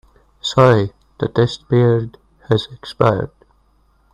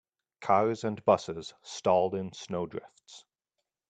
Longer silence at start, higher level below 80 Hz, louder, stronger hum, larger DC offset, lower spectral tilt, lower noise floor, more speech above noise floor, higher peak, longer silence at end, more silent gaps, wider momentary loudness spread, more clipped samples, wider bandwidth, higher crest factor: about the same, 0.45 s vs 0.4 s; first, -48 dBFS vs -72 dBFS; first, -17 LUFS vs -29 LUFS; neither; neither; first, -7 dB/octave vs -5.5 dB/octave; second, -57 dBFS vs -86 dBFS; second, 41 dB vs 57 dB; first, 0 dBFS vs -10 dBFS; first, 0.85 s vs 0.7 s; neither; about the same, 14 LU vs 14 LU; neither; about the same, 10 kHz vs 9.2 kHz; about the same, 18 dB vs 20 dB